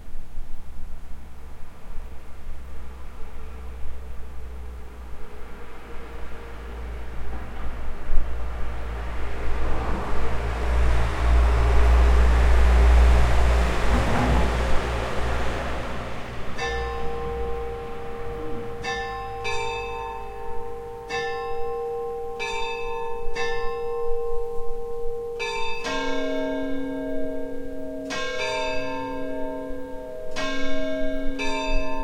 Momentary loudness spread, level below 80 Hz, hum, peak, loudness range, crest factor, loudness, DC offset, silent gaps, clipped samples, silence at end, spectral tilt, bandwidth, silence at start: 21 LU; -26 dBFS; none; -4 dBFS; 20 LU; 18 dB; -27 LUFS; under 0.1%; none; under 0.1%; 0 s; -6 dB/octave; 10 kHz; 0 s